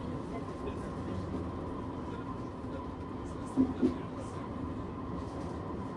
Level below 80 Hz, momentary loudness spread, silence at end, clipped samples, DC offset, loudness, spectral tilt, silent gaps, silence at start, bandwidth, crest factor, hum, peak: -52 dBFS; 9 LU; 0 s; under 0.1%; under 0.1%; -38 LUFS; -8 dB/octave; none; 0 s; 11 kHz; 20 dB; none; -16 dBFS